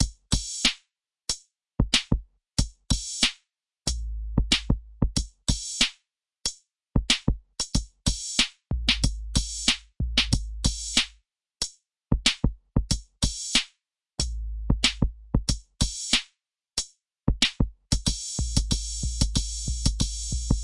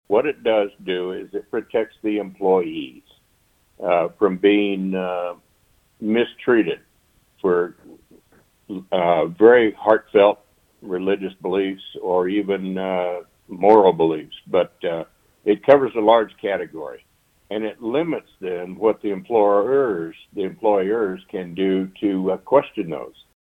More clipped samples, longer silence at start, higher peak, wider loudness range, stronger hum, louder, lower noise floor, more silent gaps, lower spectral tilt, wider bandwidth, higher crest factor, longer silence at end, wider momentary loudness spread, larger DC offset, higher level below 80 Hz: neither; about the same, 0 s vs 0.1 s; second, -6 dBFS vs 0 dBFS; second, 2 LU vs 6 LU; neither; second, -27 LUFS vs -20 LUFS; first, -72 dBFS vs -62 dBFS; neither; second, -3 dB/octave vs -8 dB/octave; first, 11.5 kHz vs 4.6 kHz; about the same, 22 dB vs 20 dB; second, 0 s vs 0.35 s; second, 8 LU vs 15 LU; neither; first, -32 dBFS vs -62 dBFS